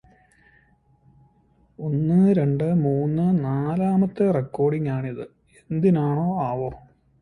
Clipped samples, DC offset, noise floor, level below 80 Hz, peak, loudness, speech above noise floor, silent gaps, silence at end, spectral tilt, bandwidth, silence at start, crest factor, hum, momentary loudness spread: under 0.1%; under 0.1%; -60 dBFS; -54 dBFS; -8 dBFS; -22 LUFS; 39 dB; none; 0.4 s; -11 dB/octave; 9.8 kHz; 1.8 s; 14 dB; none; 12 LU